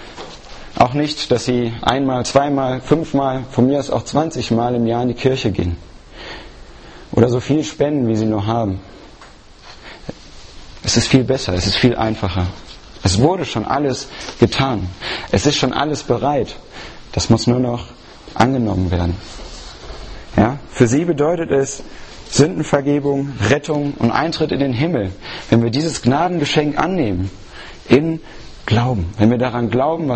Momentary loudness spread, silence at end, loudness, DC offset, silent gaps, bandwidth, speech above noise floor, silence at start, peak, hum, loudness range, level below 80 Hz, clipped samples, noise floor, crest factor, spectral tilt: 18 LU; 0 s; -17 LUFS; under 0.1%; none; 8.8 kHz; 24 dB; 0 s; 0 dBFS; none; 3 LU; -38 dBFS; under 0.1%; -41 dBFS; 18 dB; -5.5 dB/octave